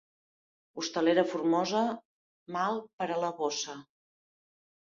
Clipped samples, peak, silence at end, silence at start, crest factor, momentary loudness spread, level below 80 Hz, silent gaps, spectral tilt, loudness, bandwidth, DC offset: under 0.1%; -12 dBFS; 1.05 s; 0.75 s; 22 dB; 13 LU; -78 dBFS; 2.05-2.46 s, 2.93-2.98 s; -4 dB/octave; -31 LUFS; 7.6 kHz; under 0.1%